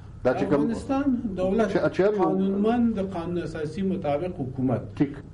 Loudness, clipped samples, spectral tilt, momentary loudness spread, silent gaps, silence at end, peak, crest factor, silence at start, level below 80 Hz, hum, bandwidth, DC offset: -25 LUFS; under 0.1%; -8 dB/octave; 7 LU; none; 0 s; -12 dBFS; 12 dB; 0 s; -48 dBFS; none; 10.5 kHz; under 0.1%